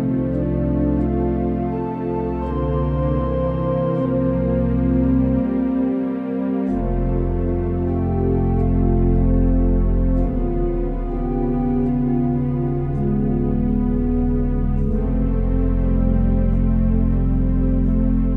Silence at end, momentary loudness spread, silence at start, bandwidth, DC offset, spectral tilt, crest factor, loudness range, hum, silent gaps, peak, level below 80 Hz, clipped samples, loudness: 0 s; 4 LU; 0 s; 3.3 kHz; under 0.1%; -12 dB/octave; 12 dB; 2 LU; none; none; -6 dBFS; -22 dBFS; under 0.1%; -20 LUFS